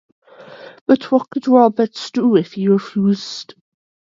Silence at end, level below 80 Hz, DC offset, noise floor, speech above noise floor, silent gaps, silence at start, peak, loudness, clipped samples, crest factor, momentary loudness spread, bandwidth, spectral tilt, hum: 0.7 s; -66 dBFS; under 0.1%; -39 dBFS; 23 dB; 0.81-0.86 s; 0.5 s; 0 dBFS; -16 LUFS; under 0.1%; 16 dB; 11 LU; 7.6 kHz; -7 dB/octave; none